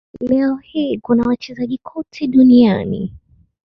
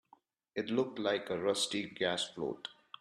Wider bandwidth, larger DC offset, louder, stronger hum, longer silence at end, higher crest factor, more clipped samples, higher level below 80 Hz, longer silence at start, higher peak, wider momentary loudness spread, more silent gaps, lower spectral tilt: second, 6 kHz vs 13 kHz; neither; first, -16 LUFS vs -35 LUFS; neither; first, 0.5 s vs 0.3 s; about the same, 14 dB vs 18 dB; neither; first, -48 dBFS vs -76 dBFS; second, 0.15 s vs 0.55 s; first, -2 dBFS vs -18 dBFS; first, 15 LU vs 10 LU; neither; first, -8.5 dB/octave vs -3 dB/octave